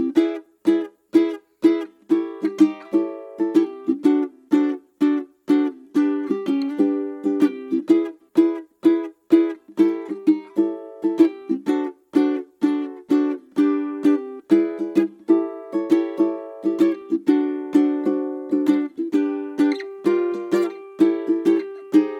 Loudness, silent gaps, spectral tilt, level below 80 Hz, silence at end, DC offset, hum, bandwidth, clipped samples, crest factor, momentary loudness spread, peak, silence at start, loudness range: -21 LUFS; none; -7 dB/octave; -78 dBFS; 0 s; under 0.1%; none; 8.2 kHz; under 0.1%; 18 dB; 6 LU; -4 dBFS; 0 s; 1 LU